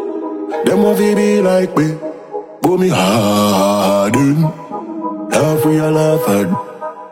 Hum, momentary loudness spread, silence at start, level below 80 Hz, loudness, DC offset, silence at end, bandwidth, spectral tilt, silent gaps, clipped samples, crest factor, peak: none; 13 LU; 0 s; -52 dBFS; -14 LUFS; under 0.1%; 0 s; 16.5 kHz; -6 dB/octave; none; under 0.1%; 14 dB; 0 dBFS